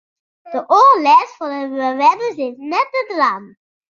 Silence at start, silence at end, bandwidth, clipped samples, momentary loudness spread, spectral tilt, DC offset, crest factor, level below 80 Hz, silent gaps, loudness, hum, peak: 0.45 s; 0.45 s; 7.2 kHz; under 0.1%; 15 LU; -3.5 dB/octave; under 0.1%; 14 dB; -74 dBFS; none; -15 LUFS; none; -2 dBFS